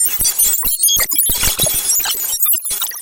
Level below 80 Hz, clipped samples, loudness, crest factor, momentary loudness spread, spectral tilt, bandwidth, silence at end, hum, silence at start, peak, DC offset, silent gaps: -34 dBFS; under 0.1%; -12 LUFS; 14 dB; 3 LU; 0.5 dB/octave; 18 kHz; 0 s; none; 0 s; 0 dBFS; under 0.1%; none